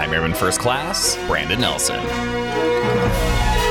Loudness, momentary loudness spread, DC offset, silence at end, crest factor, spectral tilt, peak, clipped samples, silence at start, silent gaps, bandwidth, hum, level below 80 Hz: -19 LUFS; 4 LU; under 0.1%; 0 s; 14 dB; -3.5 dB/octave; -6 dBFS; under 0.1%; 0 s; none; 18.5 kHz; none; -28 dBFS